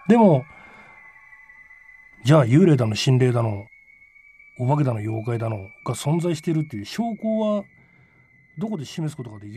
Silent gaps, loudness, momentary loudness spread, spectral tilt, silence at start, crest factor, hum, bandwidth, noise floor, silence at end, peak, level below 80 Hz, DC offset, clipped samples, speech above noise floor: none; -22 LUFS; 15 LU; -7 dB/octave; 0.05 s; 18 dB; none; 13.5 kHz; -56 dBFS; 0 s; -4 dBFS; -62 dBFS; under 0.1%; under 0.1%; 35 dB